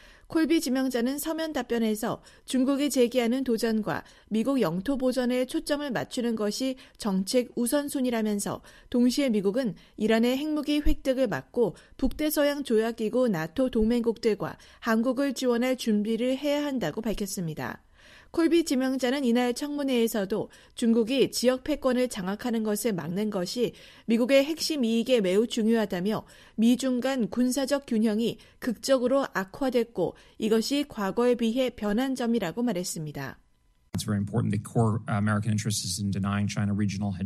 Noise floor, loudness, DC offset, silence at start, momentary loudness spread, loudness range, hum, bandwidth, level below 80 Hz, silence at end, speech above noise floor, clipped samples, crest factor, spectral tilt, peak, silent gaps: -64 dBFS; -27 LUFS; under 0.1%; 0.3 s; 8 LU; 3 LU; none; 15 kHz; -46 dBFS; 0 s; 38 dB; under 0.1%; 18 dB; -5 dB/octave; -8 dBFS; none